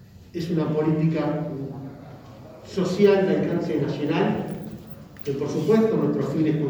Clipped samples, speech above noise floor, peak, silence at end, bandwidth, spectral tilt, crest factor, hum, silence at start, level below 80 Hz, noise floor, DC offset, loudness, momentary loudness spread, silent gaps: under 0.1%; 21 dB; -6 dBFS; 0 s; over 20 kHz; -8 dB/octave; 18 dB; none; 0 s; -56 dBFS; -43 dBFS; under 0.1%; -23 LUFS; 20 LU; none